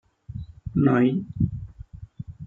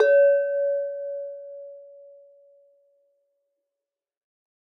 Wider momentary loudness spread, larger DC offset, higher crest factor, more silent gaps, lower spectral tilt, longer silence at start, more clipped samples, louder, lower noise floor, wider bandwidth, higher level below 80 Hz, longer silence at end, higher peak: about the same, 23 LU vs 24 LU; neither; about the same, 20 dB vs 18 dB; neither; first, -10.5 dB/octave vs 3 dB/octave; first, 0.3 s vs 0 s; neither; about the same, -23 LUFS vs -23 LUFS; second, -43 dBFS vs -88 dBFS; second, 4.1 kHz vs 5 kHz; first, -44 dBFS vs under -90 dBFS; second, 0 s vs 2.85 s; about the same, -6 dBFS vs -8 dBFS